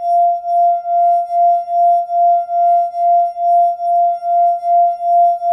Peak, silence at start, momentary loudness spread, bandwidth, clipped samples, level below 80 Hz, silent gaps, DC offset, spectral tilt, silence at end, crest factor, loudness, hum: -6 dBFS; 0 s; 1 LU; 5.8 kHz; under 0.1%; -70 dBFS; none; under 0.1%; -3.5 dB/octave; 0 s; 8 dB; -14 LUFS; none